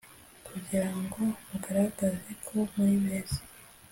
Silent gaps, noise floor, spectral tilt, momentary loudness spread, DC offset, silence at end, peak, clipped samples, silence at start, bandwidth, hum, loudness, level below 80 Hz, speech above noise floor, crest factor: none; -52 dBFS; -6 dB/octave; 16 LU; under 0.1%; 0.2 s; -14 dBFS; under 0.1%; 0.05 s; 17 kHz; none; -31 LUFS; -56 dBFS; 22 dB; 16 dB